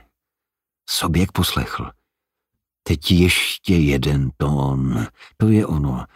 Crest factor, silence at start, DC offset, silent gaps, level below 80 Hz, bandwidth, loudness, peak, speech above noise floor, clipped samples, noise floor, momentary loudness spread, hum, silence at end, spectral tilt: 18 dB; 0.9 s; under 0.1%; none; -34 dBFS; 16 kHz; -19 LUFS; -2 dBFS; 68 dB; under 0.1%; -86 dBFS; 11 LU; none; 0.1 s; -5.5 dB/octave